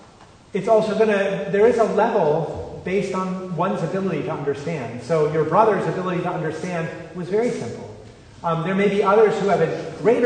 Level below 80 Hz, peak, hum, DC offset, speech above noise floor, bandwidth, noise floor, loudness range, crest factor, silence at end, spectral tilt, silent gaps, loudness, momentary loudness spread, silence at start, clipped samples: -56 dBFS; -2 dBFS; none; under 0.1%; 27 dB; 9.6 kHz; -47 dBFS; 4 LU; 18 dB; 0 s; -7 dB/octave; none; -21 LUFS; 12 LU; 0.2 s; under 0.1%